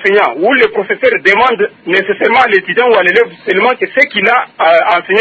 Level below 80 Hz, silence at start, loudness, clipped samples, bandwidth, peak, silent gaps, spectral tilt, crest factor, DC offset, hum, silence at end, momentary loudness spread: -56 dBFS; 0 s; -10 LUFS; 0.3%; 8 kHz; 0 dBFS; none; -5 dB/octave; 10 dB; under 0.1%; none; 0 s; 4 LU